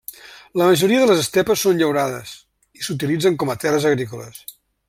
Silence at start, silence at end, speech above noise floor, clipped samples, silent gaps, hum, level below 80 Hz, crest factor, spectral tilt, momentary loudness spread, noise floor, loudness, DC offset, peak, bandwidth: 0.1 s; 0.35 s; 21 dB; under 0.1%; none; none; -58 dBFS; 16 dB; -4.5 dB/octave; 21 LU; -39 dBFS; -18 LUFS; under 0.1%; -2 dBFS; 16.5 kHz